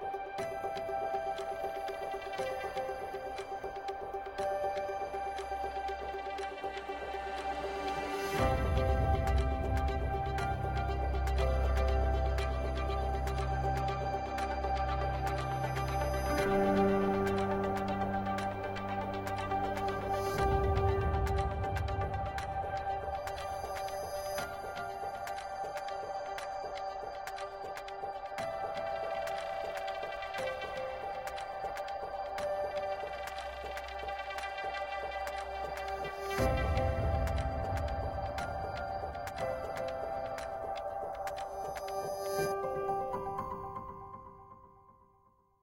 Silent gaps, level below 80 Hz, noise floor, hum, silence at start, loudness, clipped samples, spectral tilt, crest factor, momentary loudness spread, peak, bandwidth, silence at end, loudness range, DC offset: none; -42 dBFS; -68 dBFS; none; 0 s; -36 LUFS; under 0.1%; -6 dB/octave; 18 dB; 9 LU; -18 dBFS; 16.5 kHz; 0.7 s; 7 LU; under 0.1%